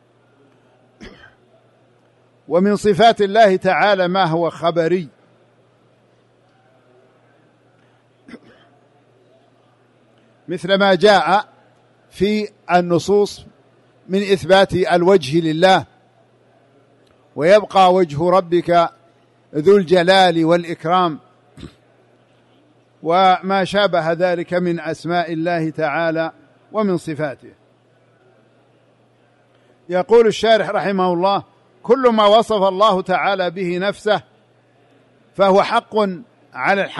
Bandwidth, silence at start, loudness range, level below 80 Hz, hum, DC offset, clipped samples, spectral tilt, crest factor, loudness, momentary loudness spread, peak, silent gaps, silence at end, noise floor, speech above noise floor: 11.5 kHz; 1 s; 7 LU; -56 dBFS; none; under 0.1%; under 0.1%; -5.5 dB/octave; 16 dB; -16 LUFS; 11 LU; -2 dBFS; none; 0 s; -55 dBFS; 40 dB